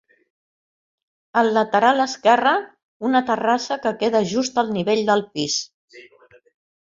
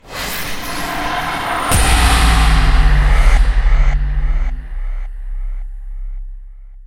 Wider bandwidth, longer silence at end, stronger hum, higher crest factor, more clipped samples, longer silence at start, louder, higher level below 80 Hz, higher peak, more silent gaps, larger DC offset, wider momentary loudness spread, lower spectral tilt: second, 7.6 kHz vs 16.5 kHz; first, 0.8 s vs 0 s; neither; first, 20 dB vs 14 dB; neither; first, 1.35 s vs 0.05 s; second, -20 LUFS vs -16 LUFS; second, -66 dBFS vs -14 dBFS; about the same, -2 dBFS vs 0 dBFS; first, 2.83-3.00 s, 5.74-5.88 s vs none; neither; second, 7 LU vs 19 LU; about the same, -3.5 dB/octave vs -4 dB/octave